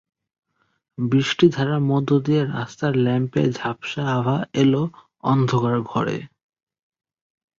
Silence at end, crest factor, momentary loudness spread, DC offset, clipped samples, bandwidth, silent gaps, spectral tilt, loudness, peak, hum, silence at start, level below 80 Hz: 1.3 s; 18 dB; 9 LU; under 0.1%; under 0.1%; 7.4 kHz; none; -7 dB/octave; -21 LUFS; -2 dBFS; none; 1 s; -58 dBFS